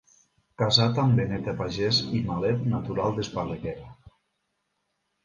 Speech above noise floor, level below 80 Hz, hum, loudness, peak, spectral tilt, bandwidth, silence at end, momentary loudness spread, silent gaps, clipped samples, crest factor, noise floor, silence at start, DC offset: 52 dB; -52 dBFS; none; -26 LUFS; -6 dBFS; -6 dB/octave; 7.4 kHz; 1.3 s; 11 LU; none; under 0.1%; 22 dB; -77 dBFS; 0.6 s; under 0.1%